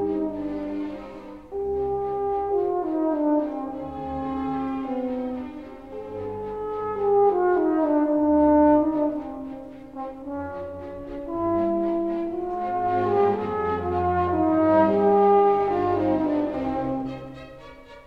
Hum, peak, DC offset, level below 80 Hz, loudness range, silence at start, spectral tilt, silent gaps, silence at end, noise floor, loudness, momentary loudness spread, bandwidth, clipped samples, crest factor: none; -8 dBFS; 0.2%; -50 dBFS; 8 LU; 0 s; -9.5 dB/octave; none; 0.05 s; -44 dBFS; -24 LUFS; 17 LU; 5 kHz; under 0.1%; 16 dB